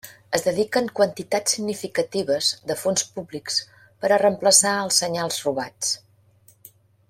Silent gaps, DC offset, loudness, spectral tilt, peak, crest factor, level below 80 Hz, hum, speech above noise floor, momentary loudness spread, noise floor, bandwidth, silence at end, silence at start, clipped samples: none; under 0.1%; -22 LUFS; -2 dB/octave; 0 dBFS; 22 dB; -66 dBFS; none; 34 dB; 10 LU; -56 dBFS; 16.5 kHz; 1.1 s; 0.05 s; under 0.1%